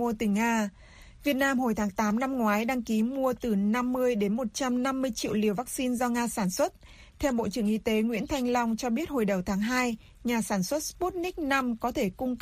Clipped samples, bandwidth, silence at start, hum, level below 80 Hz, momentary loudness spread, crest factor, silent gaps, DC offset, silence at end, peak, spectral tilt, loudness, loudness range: under 0.1%; 15.5 kHz; 0 s; none; -52 dBFS; 4 LU; 16 dB; none; under 0.1%; 0 s; -14 dBFS; -5 dB/octave; -28 LUFS; 2 LU